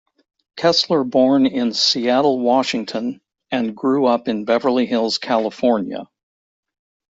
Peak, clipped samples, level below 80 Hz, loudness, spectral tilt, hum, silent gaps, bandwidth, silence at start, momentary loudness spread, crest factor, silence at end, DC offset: -4 dBFS; under 0.1%; -64 dBFS; -18 LUFS; -4.5 dB/octave; none; none; 7.8 kHz; 0.55 s; 10 LU; 16 dB; 1.05 s; under 0.1%